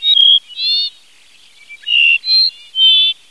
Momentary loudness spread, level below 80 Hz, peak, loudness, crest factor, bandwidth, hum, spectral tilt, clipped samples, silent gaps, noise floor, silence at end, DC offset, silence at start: 8 LU; -74 dBFS; -2 dBFS; -9 LUFS; 12 dB; 11 kHz; none; 4.5 dB/octave; under 0.1%; none; -47 dBFS; 0.15 s; 0.4%; 0 s